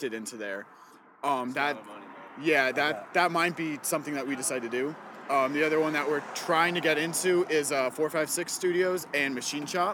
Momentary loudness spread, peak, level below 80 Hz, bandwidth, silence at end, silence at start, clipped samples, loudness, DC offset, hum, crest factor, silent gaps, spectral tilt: 11 LU; -10 dBFS; -78 dBFS; 19 kHz; 0 s; 0 s; under 0.1%; -28 LUFS; under 0.1%; none; 20 dB; none; -3 dB/octave